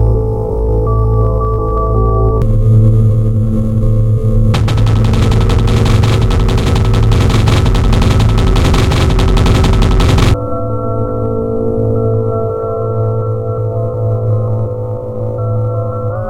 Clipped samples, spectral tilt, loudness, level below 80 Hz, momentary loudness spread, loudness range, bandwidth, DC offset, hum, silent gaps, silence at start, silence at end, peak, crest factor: under 0.1%; -7 dB/octave; -13 LUFS; -16 dBFS; 6 LU; 5 LU; 11.5 kHz; under 0.1%; none; none; 0 s; 0 s; 0 dBFS; 10 dB